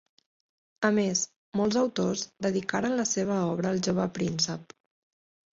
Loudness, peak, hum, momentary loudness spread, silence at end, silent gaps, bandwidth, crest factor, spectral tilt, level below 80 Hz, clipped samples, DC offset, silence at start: -28 LUFS; -10 dBFS; none; 4 LU; 0.95 s; 1.36-1.52 s; 7.8 kHz; 18 dB; -4 dB/octave; -64 dBFS; under 0.1%; under 0.1%; 0.8 s